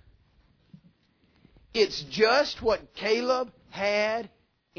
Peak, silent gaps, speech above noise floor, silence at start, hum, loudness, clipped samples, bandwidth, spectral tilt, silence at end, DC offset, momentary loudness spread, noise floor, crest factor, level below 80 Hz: -10 dBFS; none; 40 dB; 1.75 s; none; -26 LUFS; under 0.1%; 5.4 kHz; -3.5 dB/octave; 0.5 s; under 0.1%; 11 LU; -66 dBFS; 20 dB; -58 dBFS